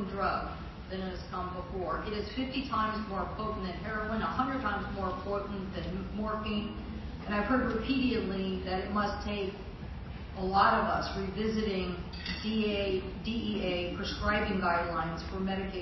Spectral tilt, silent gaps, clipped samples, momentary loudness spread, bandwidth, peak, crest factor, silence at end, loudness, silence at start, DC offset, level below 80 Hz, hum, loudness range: -7 dB/octave; none; under 0.1%; 9 LU; 6 kHz; -12 dBFS; 20 dB; 0 s; -33 LUFS; 0 s; under 0.1%; -44 dBFS; none; 4 LU